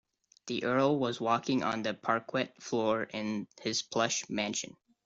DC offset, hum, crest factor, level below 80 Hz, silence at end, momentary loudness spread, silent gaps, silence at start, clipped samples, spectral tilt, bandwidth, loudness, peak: under 0.1%; none; 18 dB; -72 dBFS; 0.35 s; 8 LU; none; 0.45 s; under 0.1%; -4 dB/octave; 7.8 kHz; -32 LUFS; -14 dBFS